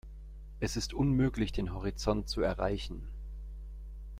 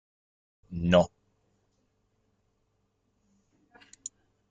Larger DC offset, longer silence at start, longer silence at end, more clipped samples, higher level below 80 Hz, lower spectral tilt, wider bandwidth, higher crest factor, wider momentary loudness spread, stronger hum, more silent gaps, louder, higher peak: neither; second, 0.05 s vs 0.7 s; second, 0 s vs 3.45 s; neither; first, -42 dBFS vs -60 dBFS; about the same, -6 dB/octave vs -6 dB/octave; first, 15.5 kHz vs 9 kHz; second, 18 dB vs 26 dB; about the same, 18 LU vs 20 LU; neither; neither; second, -33 LUFS vs -26 LUFS; second, -16 dBFS vs -8 dBFS